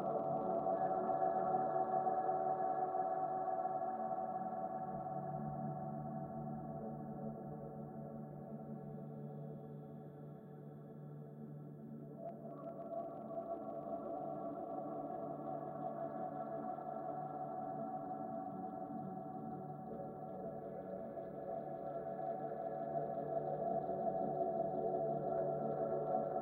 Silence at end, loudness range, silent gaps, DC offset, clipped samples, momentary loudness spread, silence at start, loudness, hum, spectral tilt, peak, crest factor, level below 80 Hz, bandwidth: 0 s; 12 LU; none; under 0.1%; under 0.1%; 12 LU; 0 s; -43 LUFS; none; -11 dB/octave; -26 dBFS; 16 dB; -76 dBFS; 3.9 kHz